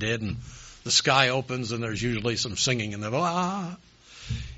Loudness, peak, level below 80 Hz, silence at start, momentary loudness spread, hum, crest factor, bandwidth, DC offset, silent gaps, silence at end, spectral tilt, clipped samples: -26 LUFS; -4 dBFS; -48 dBFS; 0 s; 17 LU; none; 24 dB; 8 kHz; under 0.1%; none; 0 s; -3 dB/octave; under 0.1%